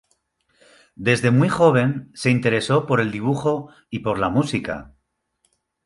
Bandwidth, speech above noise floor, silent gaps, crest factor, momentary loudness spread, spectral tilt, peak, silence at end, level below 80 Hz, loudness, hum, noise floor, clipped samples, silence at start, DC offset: 11.5 kHz; 50 dB; none; 18 dB; 12 LU; -6.5 dB/octave; -4 dBFS; 1 s; -52 dBFS; -20 LUFS; none; -70 dBFS; under 0.1%; 1 s; under 0.1%